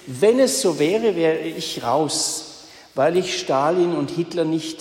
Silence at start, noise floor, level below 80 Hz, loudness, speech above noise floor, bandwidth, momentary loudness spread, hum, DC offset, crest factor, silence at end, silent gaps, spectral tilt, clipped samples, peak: 0.05 s; -43 dBFS; -64 dBFS; -20 LUFS; 23 dB; 16.5 kHz; 8 LU; none; under 0.1%; 16 dB; 0 s; none; -4 dB/octave; under 0.1%; -6 dBFS